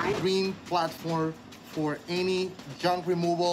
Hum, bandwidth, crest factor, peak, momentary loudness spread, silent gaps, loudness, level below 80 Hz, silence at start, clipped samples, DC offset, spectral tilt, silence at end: none; 16 kHz; 14 dB; -14 dBFS; 7 LU; none; -29 LUFS; -62 dBFS; 0 s; under 0.1%; under 0.1%; -5.5 dB/octave; 0 s